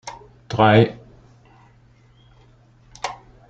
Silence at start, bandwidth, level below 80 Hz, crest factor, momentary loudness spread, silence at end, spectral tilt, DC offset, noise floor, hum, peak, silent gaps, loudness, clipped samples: 0.05 s; 8.8 kHz; -52 dBFS; 22 dB; 23 LU; 0.35 s; -6.5 dB/octave; under 0.1%; -53 dBFS; none; -2 dBFS; none; -19 LUFS; under 0.1%